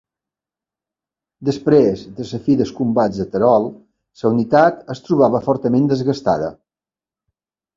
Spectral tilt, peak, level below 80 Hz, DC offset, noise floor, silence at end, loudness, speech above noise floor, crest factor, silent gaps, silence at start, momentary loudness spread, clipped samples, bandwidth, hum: -8 dB/octave; 0 dBFS; -52 dBFS; under 0.1%; under -90 dBFS; 1.25 s; -17 LUFS; over 74 dB; 18 dB; none; 1.4 s; 11 LU; under 0.1%; 7.6 kHz; none